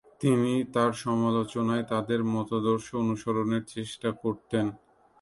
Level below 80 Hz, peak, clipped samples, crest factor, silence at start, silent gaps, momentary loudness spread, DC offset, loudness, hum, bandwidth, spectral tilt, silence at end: -62 dBFS; -12 dBFS; under 0.1%; 16 dB; 0.2 s; none; 6 LU; under 0.1%; -28 LUFS; none; 11.5 kHz; -6.5 dB/octave; 0.45 s